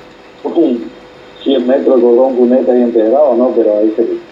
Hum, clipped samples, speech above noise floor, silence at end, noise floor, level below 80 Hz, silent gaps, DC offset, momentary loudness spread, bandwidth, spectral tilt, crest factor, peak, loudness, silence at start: none; under 0.1%; 25 dB; 0.05 s; -35 dBFS; -58 dBFS; none; under 0.1%; 10 LU; 5.6 kHz; -7.5 dB/octave; 12 dB; 0 dBFS; -11 LUFS; 0.45 s